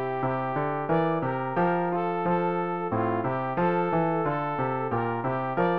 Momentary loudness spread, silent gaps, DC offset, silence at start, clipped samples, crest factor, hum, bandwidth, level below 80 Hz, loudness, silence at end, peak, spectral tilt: 3 LU; none; 0.3%; 0 s; under 0.1%; 12 dB; none; 5.2 kHz; -60 dBFS; -27 LUFS; 0 s; -14 dBFS; -10.5 dB/octave